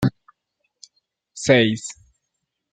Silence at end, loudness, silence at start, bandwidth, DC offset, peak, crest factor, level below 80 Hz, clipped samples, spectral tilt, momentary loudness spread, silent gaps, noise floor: 0.8 s; -19 LUFS; 0 s; 13.5 kHz; under 0.1%; -2 dBFS; 22 dB; -52 dBFS; under 0.1%; -5 dB/octave; 20 LU; none; -78 dBFS